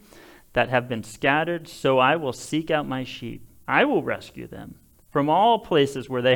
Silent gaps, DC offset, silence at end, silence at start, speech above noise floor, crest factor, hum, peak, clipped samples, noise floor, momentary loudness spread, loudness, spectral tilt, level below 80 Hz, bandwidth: none; under 0.1%; 0 s; 0.55 s; 26 dB; 20 dB; none; -4 dBFS; under 0.1%; -49 dBFS; 18 LU; -23 LUFS; -5.5 dB/octave; -56 dBFS; 19.5 kHz